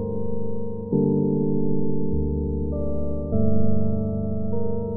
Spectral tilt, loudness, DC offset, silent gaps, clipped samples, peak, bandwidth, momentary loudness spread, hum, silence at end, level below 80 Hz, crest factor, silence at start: -16 dB/octave; -25 LUFS; under 0.1%; none; under 0.1%; -6 dBFS; 1.4 kHz; 7 LU; none; 0 s; -34 dBFS; 14 dB; 0 s